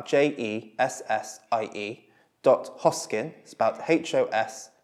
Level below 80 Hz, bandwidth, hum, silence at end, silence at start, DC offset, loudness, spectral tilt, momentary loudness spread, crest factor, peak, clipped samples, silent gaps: -84 dBFS; 14 kHz; none; 0.2 s; 0 s; under 0.1%; -27 LUFS; -4 dB/octave; 10 LU; 20 dB; -6 dBFS; under 0.1%; none